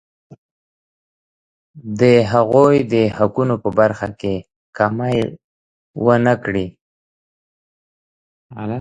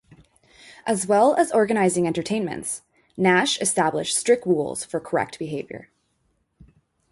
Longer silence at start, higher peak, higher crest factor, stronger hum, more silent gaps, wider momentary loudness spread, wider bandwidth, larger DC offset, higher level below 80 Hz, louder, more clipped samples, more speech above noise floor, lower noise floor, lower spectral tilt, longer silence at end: second, 0.3 s vs 0.65 s; first, 0 dBFS vs -6 dBFS; about the same, 18 dB vs 18 dB; neither; first, 0.38-1.74 s, 4.56-4.73 s, 5.44-5.94 s, 6.81-8.50 s vs none; about the same, 15 LU vs 14 LU; second, 9.4 kHz vs 12 kHz; neither; first, -50 dBFS vs -62 dBFS; first, -17 LUFS vs -22 LUFS; neither; first, over 74 dB vs 48 dB; first, under -90 dBFS vs -69 dBFS; first, -7.5 dB/octave vs -4 dB/octave; second, 0 s vs 1.3 s